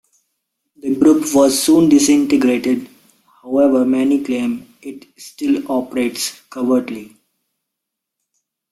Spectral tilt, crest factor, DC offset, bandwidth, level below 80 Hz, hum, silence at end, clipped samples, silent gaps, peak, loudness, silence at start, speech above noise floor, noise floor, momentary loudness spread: -4 dB/octave; 16 dB; under 0.1%; 15 kHz; -58 dBFS; none; 1.7 s; under 0.1%; none; -2 dBFS; -15 LUFS; 0.85 s; 65 dB; -80 dBFS; 18 LU